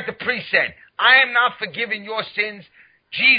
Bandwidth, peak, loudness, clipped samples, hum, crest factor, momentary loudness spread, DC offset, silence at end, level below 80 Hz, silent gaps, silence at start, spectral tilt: 5.2 kHz; -2 dBFS; -18 LUFS; under 0.1%; none; 18 dB; 13 LU; under 0.1%; 0 s; -62 dBFS; none; 0 s; -7 dB/octave